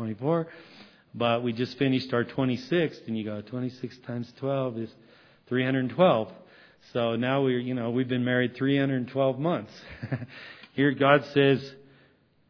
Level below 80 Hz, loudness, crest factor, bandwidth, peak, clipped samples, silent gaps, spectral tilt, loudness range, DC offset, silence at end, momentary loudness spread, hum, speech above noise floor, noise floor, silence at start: -68 dBFS; -27 LUFS; 24 dB; 5.4 kHz; -4 dBFS; under 0.1%; none; -8 dB/octave; 4 LU; under 0.1%; 0.75 s; 16 LU; none; 36 dB; -62 dBFS; 0 s